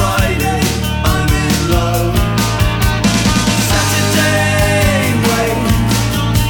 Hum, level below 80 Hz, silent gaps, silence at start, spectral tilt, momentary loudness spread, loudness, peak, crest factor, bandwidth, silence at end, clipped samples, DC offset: none; -22 dBFS; none; 0 s; -4.5 dB/octave; 3 LU; -13 LUFS; 0 dBFS; 12 dB; over 20 kHz; 0 s; under 0.1%; under 0.1%